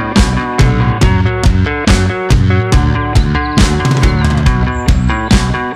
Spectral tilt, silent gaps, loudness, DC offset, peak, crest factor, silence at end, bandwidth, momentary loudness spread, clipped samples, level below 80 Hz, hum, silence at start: -6 dB/octave; none; -12 LUFS; under 0.1%; 0 dBFS; 10 dB; 0 s; 13 kHz; 2 LU; under 0.1%; -16 dBFS; none; 0 s